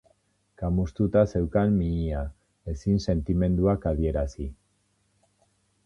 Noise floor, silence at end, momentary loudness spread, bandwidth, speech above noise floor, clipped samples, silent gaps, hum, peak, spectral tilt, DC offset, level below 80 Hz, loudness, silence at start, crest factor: -70 dBFS; 1.35 s; 14 LU; 7.6 kHz; 45 dB; under 0.1%; none; none; -8 dBFS; -9 dB/octave; under 0.1%; -36 dBFS; -26 LUFS; 0.6 s; 20 dB